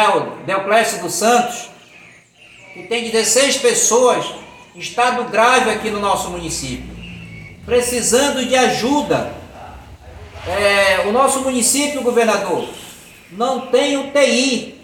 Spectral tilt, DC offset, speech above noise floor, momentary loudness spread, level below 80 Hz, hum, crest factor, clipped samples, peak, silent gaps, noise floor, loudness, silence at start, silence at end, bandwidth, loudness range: -2 dB/octave; under 0.1%; 29 dB; 21 LU; -46 dBFS; none; 16 dB; under 0.1%; 0 dBFS; none; -45 dBFS; -16 LUFS; 0 s; 0.1 s; 17 kHz; 3 LU